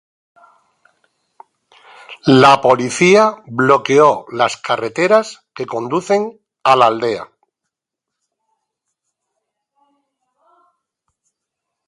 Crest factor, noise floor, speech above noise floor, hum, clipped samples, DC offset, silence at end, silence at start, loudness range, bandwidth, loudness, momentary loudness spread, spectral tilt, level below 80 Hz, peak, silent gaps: 18 dB; -82 dBFS; 68 dB; none; under 0.1%; under 0.1%; 4.65 s; 2.1 s; 7 LU; 11.5 kHz; -14 LUFS; 14 LU; -5 dB/octave; -62 dBFS; 0 dBFS; none